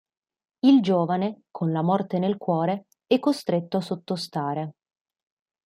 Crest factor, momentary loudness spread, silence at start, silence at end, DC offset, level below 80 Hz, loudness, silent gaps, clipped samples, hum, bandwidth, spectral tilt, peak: 18 dB; 11 LU; 0.65 s; 0.95 s; under 0.1%; -72 dBFS; -24 LUFS; none; under 0.1%; none; 13 kHz; -7.5 dB/octave; -8 dBFS